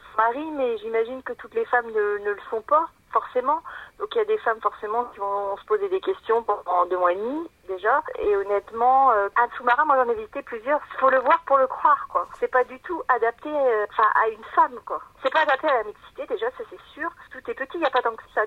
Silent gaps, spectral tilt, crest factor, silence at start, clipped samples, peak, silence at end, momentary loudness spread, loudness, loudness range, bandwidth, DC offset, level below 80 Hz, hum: none; -5 dB/octave; 18 dB; 0.05 s; under 0.1%; -6 dBFS; 0 s; 13 LU; -23 LUFS; 4 LU; 8.4 kHz; under 0.1%; -60 dBFS; none